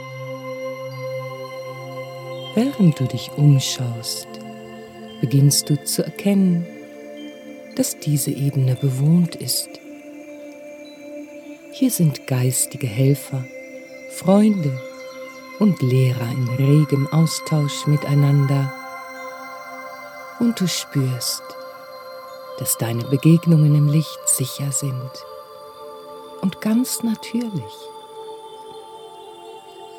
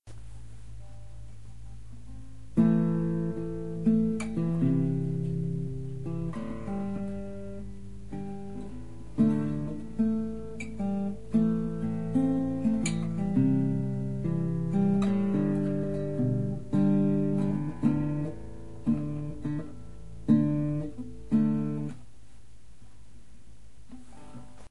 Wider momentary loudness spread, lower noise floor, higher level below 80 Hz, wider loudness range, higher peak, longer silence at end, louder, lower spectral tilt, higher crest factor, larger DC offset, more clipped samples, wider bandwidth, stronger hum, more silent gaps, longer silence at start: about the same, 22 LU vs 22 LU; second, -39 dBFS vs -55 dBFS; second, -66 dBFS vs -48 dBFS; about the same, 6 LU vs 6 LU; first, -2 dBFS vs -12 dBFS; about the same, 0 s vs 0 s; first, -20 LUFS vs -29 LUFS; second, -5.5 dB/octave vs -8.5 dB/octave; about the same, 18 dB vs 18 dB; second, under 0.1% vs 1%; neither; first, 18.5 kHz vs 11.5 kHz; neither; neither; about the same, 0 s vs 0 s